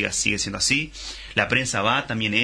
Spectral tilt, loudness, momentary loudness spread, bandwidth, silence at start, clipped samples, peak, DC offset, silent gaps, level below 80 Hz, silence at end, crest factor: -2.5 dB/octave; -22 LUFS; 5 LU; 10.5 kHz; 0 s; under 0.1%; -4 dBFS; under 0.1%; none; -46 dBFS; 0 s; 18 dB